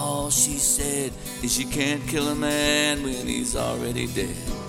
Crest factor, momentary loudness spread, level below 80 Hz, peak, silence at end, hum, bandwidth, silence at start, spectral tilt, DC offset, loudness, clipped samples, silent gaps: 18 dB; 8 LU; -38 dBFS; -6 dBFS; 0 s; none; 17 kHz; 0 s; -2.5 dB/octave; under 0.1%; -23 LUFS; under 0.1%; none